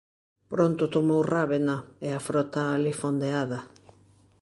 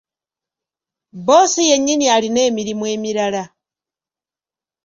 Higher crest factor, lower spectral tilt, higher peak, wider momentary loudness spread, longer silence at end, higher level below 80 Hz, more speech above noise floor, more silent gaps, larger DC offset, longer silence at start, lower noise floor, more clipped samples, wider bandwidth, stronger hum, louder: about the same, 18 dB vs 18 dB; first, -6.5 dB/octave vs -2.5 dB/octave; second, -10 dBFS vs -2 dBFS; about the same, 9 LU vs 11 LU; second, 0.75 s vs 1.4 s; about the same, -66 dBFS vs -62 dBFS; second, 33 dB vs over 75 dB; neither; neither; second, 0.5 s vs 1.15 s; second, -59 dBFS vs under -90 dBFS; neither; first, 11.5 kHz vs 7.6 kHz; neither; second, -27 LUFS vs -15 LUFS